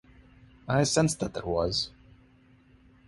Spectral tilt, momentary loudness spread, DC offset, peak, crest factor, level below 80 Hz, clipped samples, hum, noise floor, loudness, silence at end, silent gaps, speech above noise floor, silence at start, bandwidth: -4.5 dB/octave; 10 LU; under 0.1%; -12 dBFS; 20 dB; -52 dBFS; under 0.1%; none; -59 dBFS; -28 LUFS; 1.2 s; none; 32 dB; 0.65 s; 12 kHz